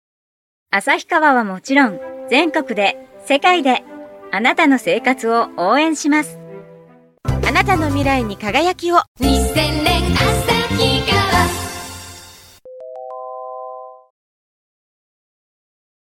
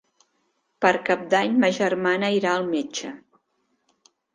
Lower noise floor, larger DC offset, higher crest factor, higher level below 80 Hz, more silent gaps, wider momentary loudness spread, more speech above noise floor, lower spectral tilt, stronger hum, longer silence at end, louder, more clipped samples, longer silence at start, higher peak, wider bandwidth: second, -46 dBFS vs -72 dBFS; neither; about the same, 18 dB vs 22 dB; first, -32 dBFS vs -70 dBFS; first, 9.08-9.15 s vs none; first, 18 LU vs 9 LU; second, 30 dB vs 50 dB; about the same, -4.5 dB/octave vs -4.5 dB/octave; neither; first, 2.15 s vs 1.15 s; first, -16 LUFS vs -22 LUFS; neither; about the same, 0.7 s vs 0.8 s; first, 0 dBFS vs -4 dBFS; first, 16.5 kHz vs 9.8 kHz